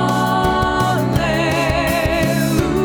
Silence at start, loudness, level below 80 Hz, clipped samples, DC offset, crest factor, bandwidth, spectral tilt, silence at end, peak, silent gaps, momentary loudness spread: 0 s; -17 LUFS; -30 dBFS; under 0.1%; under 0.1%; 14 dB; 19 kHz; -5.5 dB/octave; 0 s; -2 dBFS; none; 1 LU